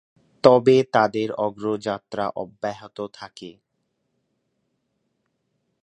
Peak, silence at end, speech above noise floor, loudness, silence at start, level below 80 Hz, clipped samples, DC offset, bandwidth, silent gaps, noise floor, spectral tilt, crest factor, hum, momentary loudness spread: 0 dBFS; 2.3 s; 53 dB; -21 LUFS; 0.45 s; -66 dBFS; under 0.1%; under 0.1%; 9.2 kHz; none; -74 dBFS; -6.5 dB/octave; 24 dB; none; 19 LU